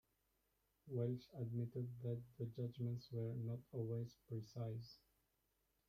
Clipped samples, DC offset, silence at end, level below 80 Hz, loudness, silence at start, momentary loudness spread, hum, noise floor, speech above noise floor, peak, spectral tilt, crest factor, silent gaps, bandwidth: under 0.1%; under 0.1%; 0.95 s; -78 dBFS; -48 LUFS; 0.85 s; 6 LU; none; -85 dBFS; 38 dB; -30 dBFS; -9 dB/octave; 18 dB; none; 14.5 kHz